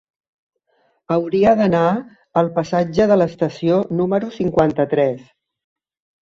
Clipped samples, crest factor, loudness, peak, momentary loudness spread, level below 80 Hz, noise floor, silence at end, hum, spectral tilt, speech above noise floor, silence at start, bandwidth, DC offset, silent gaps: under 0.1%; 16 dB; -18 LUFS; -2 dBFS; 7 LU; -52 dBFS; -63 dBFS; 1.05 s; none; -8 dB/octave; 46 dB; 1.1 s; 7.6 kHz; under 0.1%; none